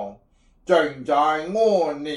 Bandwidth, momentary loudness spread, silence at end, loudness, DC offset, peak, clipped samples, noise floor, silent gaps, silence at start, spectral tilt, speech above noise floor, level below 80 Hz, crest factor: 11.5 kHz; 10 LU; 0 s; -21 LUFS; under 0.1%; -6 dBFS; under 0.1%; -58 dBFS; none; 0 s; -5 dB/octave; 37 dB; -60 dBFS; 16 dB